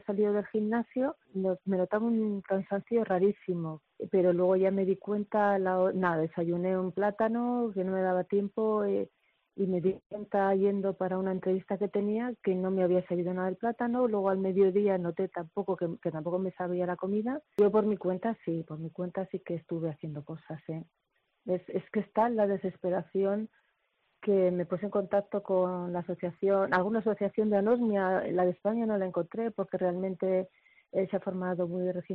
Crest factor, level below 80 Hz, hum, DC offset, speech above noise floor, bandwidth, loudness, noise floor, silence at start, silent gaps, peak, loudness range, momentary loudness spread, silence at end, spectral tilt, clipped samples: 16 dB; -72 dBFS; none; under 0.1%; 46 dB; 4.7 kHz; -30 LUFS; -76 dBFS; 0.1 s; 10.06-10.10 s; -14 dBFS; 4 LU; 9 LU; 0 s; -7.5 dB/octave; under 0.1%